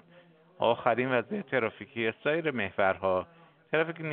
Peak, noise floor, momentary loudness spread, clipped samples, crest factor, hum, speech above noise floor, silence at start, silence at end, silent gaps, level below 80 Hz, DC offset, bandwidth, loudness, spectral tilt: -8 dBFS; -58 dBFS; 6 LU; under 0.1%; 22 dB; none; 29 dB; 0.6 s; 0 s; none; -72 dBFS; under 0.1%; 4.3 kHz; -30 LUFS; -3.5 dB/octave